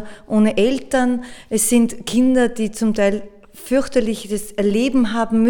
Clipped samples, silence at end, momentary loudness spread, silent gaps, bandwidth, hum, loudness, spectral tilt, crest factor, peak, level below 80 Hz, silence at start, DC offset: under 0.1%; 0 s; 9 LU; none; 19 kHz; none; -18 LUFS; -4.5 dB/octave; 14 dB; -4 dBFS; -42 dBFS; 0 s; under 0.1%